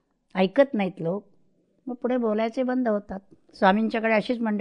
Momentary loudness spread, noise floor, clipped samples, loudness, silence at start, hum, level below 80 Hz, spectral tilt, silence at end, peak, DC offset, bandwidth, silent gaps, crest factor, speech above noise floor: 14 LU; -64 dBFS; under 0.1%; -25 LUFS; 0.35 s; none; -64 dBFS; -8 dB/octave; 0 s; -6 dBFS; under 0.1%; 9.4 kHz; none; 20 dB; 40 dB